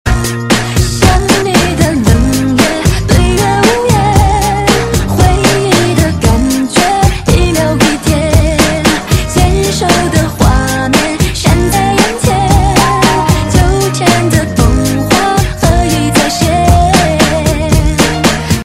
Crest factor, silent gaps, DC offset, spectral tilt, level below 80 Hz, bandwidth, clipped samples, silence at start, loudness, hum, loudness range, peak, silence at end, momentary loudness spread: 8 dB; none; under 0.1%; -5 dB/octave; -18 dBFS; 16.5 kHz; 0.4%; 0.05 s; -10 LUFS; none; 1 LU; 0 dBFS; 0 s; 3 LU